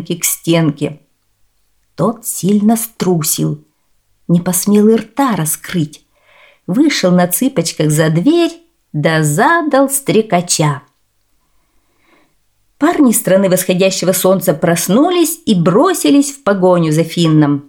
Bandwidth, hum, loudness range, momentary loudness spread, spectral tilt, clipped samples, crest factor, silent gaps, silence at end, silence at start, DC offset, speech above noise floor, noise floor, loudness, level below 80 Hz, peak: 19.5 kHz; none; 5 LU; 7 LU; -5 dB/octave; under 0.1%; 14 dB; none; 0.05 s; 0 s; 0.1%; 49 dB; -61 dBFS; -13 LUFS; -56 dBFS; 0 dBFS